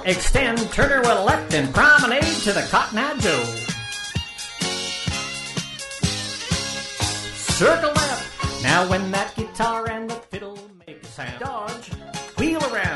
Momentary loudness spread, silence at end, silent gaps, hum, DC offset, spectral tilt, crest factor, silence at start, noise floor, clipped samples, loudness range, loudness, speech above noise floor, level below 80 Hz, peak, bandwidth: 14 LU; 0 s; none; none; under 0.1%; -3.5 dB/octave; 18 dB; 0 s; -42 dBFS; under 0.1%; 9 LU; -21 LUFS; 23 dB; -36 dBFS; -4 dBFS; 11.5 kHz